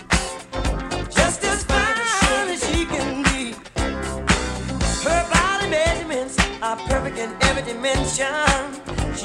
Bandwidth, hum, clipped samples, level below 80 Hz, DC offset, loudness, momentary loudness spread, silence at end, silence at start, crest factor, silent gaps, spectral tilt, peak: 15.5 kHz; none; under 0.1%; -30 dBFS; under 0.1%; -21 LUFS; 8 LU; 0 s; 0 s; 20 dB; none; -3.5 dB/octave; -2 dBFS